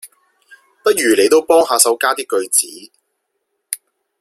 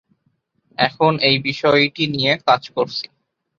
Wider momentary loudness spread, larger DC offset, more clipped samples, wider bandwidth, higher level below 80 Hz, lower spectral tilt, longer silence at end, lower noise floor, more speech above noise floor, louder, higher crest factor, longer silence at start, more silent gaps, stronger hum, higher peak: first, 16 LU vs 10 LU; neither; neither; first, 16.5 kHz vs 7.4 kHz; about the same, -62 dBFS vs -58 dBFS; second, -0.5 dB/octave vs -5.5 dB/octave; about the same, 0.45 s vs 0.55 s; first, -72 dBFS vs -67 dBFS; first, 58 dB vs 49 dB; first, -14 LUFS vs -17 LUFS; about the same, 16 dB vs 18 dB; second, 0.05 s vs 0.8 s; neither; neither; about the same, 0 dBFS vs -2 dBFS